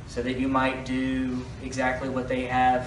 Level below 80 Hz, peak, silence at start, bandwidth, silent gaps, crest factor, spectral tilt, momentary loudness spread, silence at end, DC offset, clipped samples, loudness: -44 dBFS; -10 dBFS; 0 s; 11 kHz; none; 16 dB; -6 dB/octave; 7 LU; 0 s; under 0.1%; under 0.1%; -27 LUFS